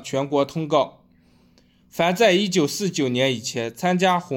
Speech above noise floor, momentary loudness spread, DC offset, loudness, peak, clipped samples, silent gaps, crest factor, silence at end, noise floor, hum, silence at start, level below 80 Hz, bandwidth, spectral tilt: 36 dB; 8 LU; under 0.1%; -21 LUFS; -4 dBFS; under 0.1%; none; 18 dB; 0 s; -57 dBFS; none; 0 s; -64 dBFS; 17 kHz; -4.5 dB/octave